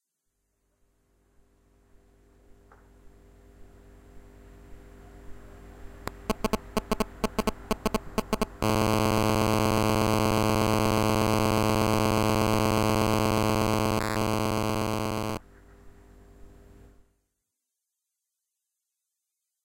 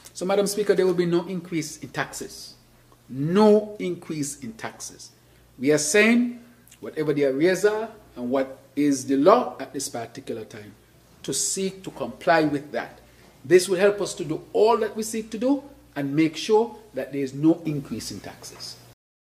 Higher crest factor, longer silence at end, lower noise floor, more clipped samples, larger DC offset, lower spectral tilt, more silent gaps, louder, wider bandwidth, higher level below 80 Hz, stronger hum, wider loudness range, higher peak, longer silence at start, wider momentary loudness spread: about the same, 18 dB vs 22 dB; first, 3.15 s vs 0.55 s; first, -84 dBFS vs -55 dBFS; neither; neither; about the same, -5.5 dB/octave vs -4.5 dB/octave; neither; second, -26 LUFS vs -23 LUFS; first, 17 kHz vs 15 kHz; first, -44 dBFS vs -62 dBFS; neither; first, 13 LU vs 3 LU; second, -10 dBFS vs -2 dBFS; first, 3.05 s vs 0.05 s; second, 7 LU vs 19 LU